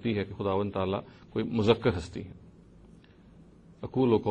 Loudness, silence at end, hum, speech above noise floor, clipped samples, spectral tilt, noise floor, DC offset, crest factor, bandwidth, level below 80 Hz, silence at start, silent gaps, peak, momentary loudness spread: -30 LUFS; 0 s; none; 26 dB; under 0.1%; -7.5 dB/octave; -55 dBFS; under 0.1%; 22 dB; 9.4 kHz; -54 dBFS; 0 s; none; -8 dBFS; 16 LU